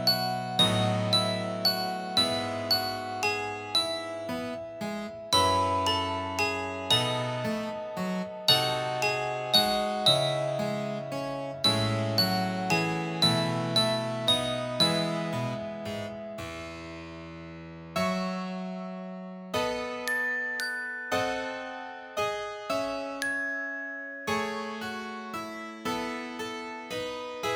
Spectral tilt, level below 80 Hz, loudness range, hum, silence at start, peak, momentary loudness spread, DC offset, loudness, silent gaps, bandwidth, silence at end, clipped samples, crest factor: -4 dB/octave; -60 dBFS; 8 LU; none; 0 s; -6 dBFS; 13 LU; under 0.1%; -28 LUFS; none; over 20 kHz; 0 s; under 0.1%; 22 dB